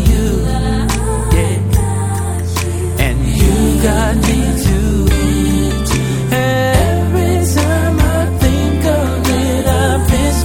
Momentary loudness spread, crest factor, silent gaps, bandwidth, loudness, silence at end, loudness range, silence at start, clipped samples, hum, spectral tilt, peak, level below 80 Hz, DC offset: 3 LU; 12 dB; none; 18 kHz; -14 LUFS; 0 s; 1 LU; 0 s; under 0.1%; none; -5.5 dB/octave; 0 dBFS; -18 dBFS; under 0.1%